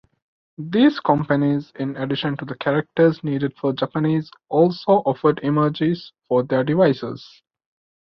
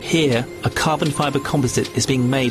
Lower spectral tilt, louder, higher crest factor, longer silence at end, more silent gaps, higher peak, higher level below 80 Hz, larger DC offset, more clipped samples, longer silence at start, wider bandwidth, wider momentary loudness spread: first, -9 dB/octave vs -5 dB/octave; about the same, -20 LUFS vs -19 LUFS; about the same, 18 dB vs 14 dB; first, 0.75 s vs 0 s; neither; about the same, -2 dBFS vs -4 dBFS; second, -60 dBFS vs -44 dBFS; neither; neither; first, 0.6 s vs 0 s; second, 6 kHz vs 13.5 kHz; first, 9 LU vs 3 LU